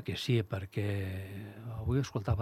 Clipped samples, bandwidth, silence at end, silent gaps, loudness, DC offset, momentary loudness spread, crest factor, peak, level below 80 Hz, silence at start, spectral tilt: under 0.1%; 14.5 kHz; 0 s; none; -35 LUFS; under 0.1%; 12 LU; 16 dB; -18 dBFS; -50 dBFS; 0 s; -6.5 dB/octave